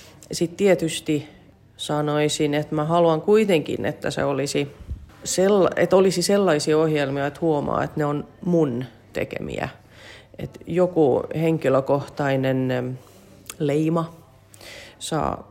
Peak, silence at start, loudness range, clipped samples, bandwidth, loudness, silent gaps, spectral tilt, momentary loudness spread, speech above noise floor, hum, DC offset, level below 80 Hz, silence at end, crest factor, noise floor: -6 dBFS; 0.3 s; 5 LU; under 0.1%; 16 kHz; -22 LUFS; none; -5.5 dB/octave; 15 LU; 25 dB; none; under 0.1%; -50 dBFS; 0.1 s; 16 dB; -47 dBFS